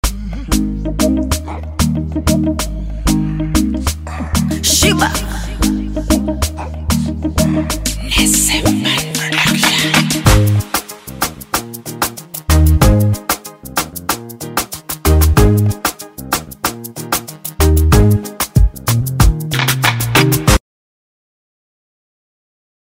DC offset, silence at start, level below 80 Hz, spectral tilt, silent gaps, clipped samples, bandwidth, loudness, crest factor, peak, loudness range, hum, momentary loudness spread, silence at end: under 0.1%; 0.05 s; -20 dBFS; -4 dB/octave; none; under 0.1%; 16.5 kHz; -15 LUFS; 14 dB; 0 dBFS; 4 LU; none; 10 LU; 2.3 s